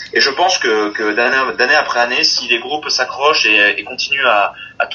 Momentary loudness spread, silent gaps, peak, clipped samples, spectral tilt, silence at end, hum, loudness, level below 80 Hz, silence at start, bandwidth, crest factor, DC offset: 7 LU; none; 0 dBFS; under 0.1%; -0.5 dB/octave; 0 s; none; -13 LUFS; -58 dBFS; 0 s; 10 kHz; 14 dB; under 0.1%